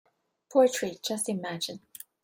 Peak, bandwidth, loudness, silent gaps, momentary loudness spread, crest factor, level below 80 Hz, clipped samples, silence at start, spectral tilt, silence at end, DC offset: -10 dBFS; 16.5 kHz; -28 LUFS; none; 15 LU; 20 dB; -76 dBFS; under 0.1%; 0.5 s; -3.5 dB/octave; 0.45 s; under 0.1%